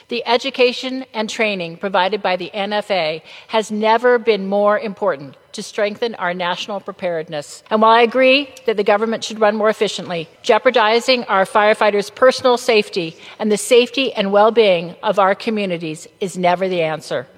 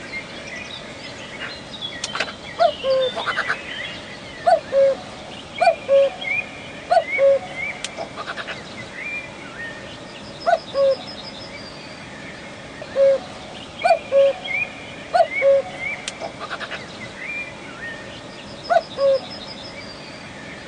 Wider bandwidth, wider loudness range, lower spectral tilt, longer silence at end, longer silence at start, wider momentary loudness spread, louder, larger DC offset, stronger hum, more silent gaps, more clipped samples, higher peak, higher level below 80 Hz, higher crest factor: first, 15 kHz vs 10 kHz; about the same, 4 LU vs 6 LU; about the same, -4 dB/octave vs -3.5 dB/octave; first, 0.15 s vs 0 s; about the same, 0.1 s vs 0 s; second, 11 LU vs 17 LU; first, -17 LUFS vs -22 LUFS; neither; neither; neither; neither; first, -2 dBFS vs -6 dBFS; second, -68 dBFS vs -56 dBFS; about the same, 16 dB vs 18 dB